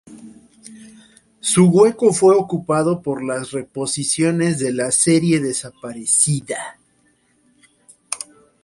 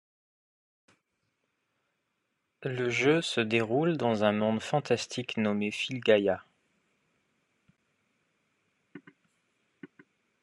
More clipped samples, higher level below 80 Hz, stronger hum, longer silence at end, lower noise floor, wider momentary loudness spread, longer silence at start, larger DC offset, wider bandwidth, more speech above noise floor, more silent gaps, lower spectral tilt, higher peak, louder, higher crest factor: neither; first, -58 dBFS vs -78 dBFS; neither; second, 0.4 s vs 0.55 s; second, -60 dBFS vs -80 dBFS; first, 15 LU vs 7 LU; second, 0.1 s vs 2.6 s; neither; about the same, 11.5 kHz vs 11.5 kHz; second, 43 dB vs 52 dB; neither; about the same, -4.5 dB/octave vs -5.5 dB/octave; first, 0 dBFS vs -10 dBFS; first, -17 LUFS vs -28 LUFS; about the same, 18 dB vs 22 dB